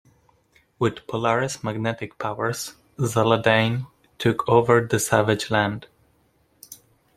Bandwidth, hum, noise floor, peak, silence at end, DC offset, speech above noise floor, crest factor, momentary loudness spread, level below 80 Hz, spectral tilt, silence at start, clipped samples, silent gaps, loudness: 15.5 kHz; none; -63 dBFS; -2 dBFS; 0.4 s; under 0.1%; 42 dB; 22 dB; 15 LU; -58 dBFS; -5 dB/octave; 0.8 s; under 0.1%; none; -22 LUFS